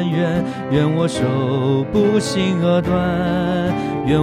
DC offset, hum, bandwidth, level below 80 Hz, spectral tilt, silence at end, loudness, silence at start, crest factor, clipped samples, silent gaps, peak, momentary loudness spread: under 0.1%; none; 12 kHz; -42 dBFS; -7 dB/octave; 0 s; -18 LUFS; 0 s; 14 dB; under 0.1%; none; -2 dBFS; 4 LU